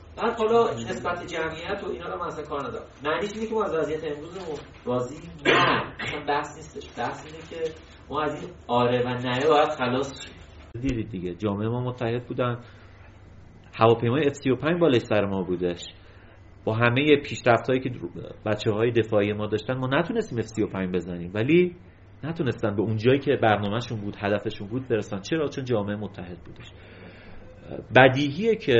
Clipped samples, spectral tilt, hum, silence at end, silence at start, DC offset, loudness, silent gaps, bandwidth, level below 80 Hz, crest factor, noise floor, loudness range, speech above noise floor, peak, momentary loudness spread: under 0.1%; -4.5 dB/octave; none; 0 s; 0 s; under 0.1%; -25 LUFS; none; 8 kHz; -52 dBFS; 24 dB; -48 dBFS; 6 LU; 23 dB; 0 dBFS; 16 LU